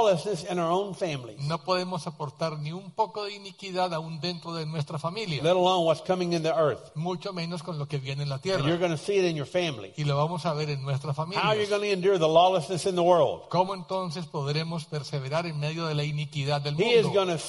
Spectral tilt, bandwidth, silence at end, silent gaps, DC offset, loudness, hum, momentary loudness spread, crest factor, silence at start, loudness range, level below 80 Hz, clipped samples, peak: -5.5 dB/octave; 11.5 kHz; 0 s; none; under 0.1%; -27 LUFS; none; 11 LU; 20 dB; 0 s; 7 LU; -64 dBFS; under 0.1%; -8 dBFS